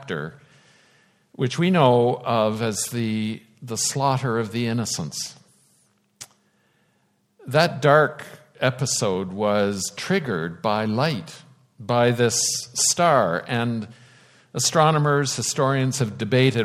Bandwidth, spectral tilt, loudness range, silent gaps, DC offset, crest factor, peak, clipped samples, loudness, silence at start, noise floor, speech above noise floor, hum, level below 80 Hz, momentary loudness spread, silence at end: 16 kHz; -4 dB/octave; 6 LU; none; under 0.1%; 22 dB; -2 dBFS; under 0.1%; -22 LUFS; 0 s; -66 dBFS; 45 dB; none; -64 dBFS; 14 LU; 0 s